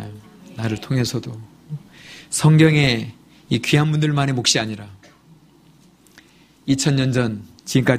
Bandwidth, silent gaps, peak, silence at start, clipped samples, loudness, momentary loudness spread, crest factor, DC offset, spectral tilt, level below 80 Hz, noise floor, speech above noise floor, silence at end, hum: 15.5 kHz; none; 0 dBFS; 0 s; under 0.1%; -19 LUFS; 21 LU; 20 dB; under 0.1%; -5 dB/octave; -50 dBFS; -52 dBFS; 33 dB; 0 s; none